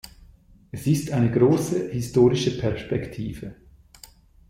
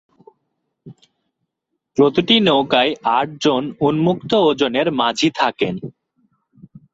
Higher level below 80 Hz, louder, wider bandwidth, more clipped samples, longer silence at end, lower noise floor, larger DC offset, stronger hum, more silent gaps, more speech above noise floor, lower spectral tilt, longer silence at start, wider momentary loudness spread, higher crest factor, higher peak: first, -48 dBFS vs -58 dBFS; second, -23 LUFS vs -17 LUFS; first, 15.5 kHz vs 8 kHz; neither; about the same, 0.95 s vs 1.05 s; second, -52 dBFS vs -77 dBFS; neither; neither; neither; second, 30 dB vs 60 dB; first, -7 dB/octave vs -5 dB/octave; second, 0.05 s vs 0.85 s; first, 15 LU vs 9 LU; about the same, 18 dB vs 16 dB; second, -6 dBFS vs -2 dBFS